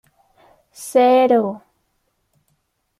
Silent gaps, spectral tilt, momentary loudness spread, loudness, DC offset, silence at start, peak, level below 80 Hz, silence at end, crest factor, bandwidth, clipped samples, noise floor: none; -5 dB/octave; 22 LU; -16 LUFS; under 0.1%; 0.8 s; -4 dBFS; -70 dBFS; 1.4 s; 16 dB; 13.5 kHz; under 0.1%; -69 dBFS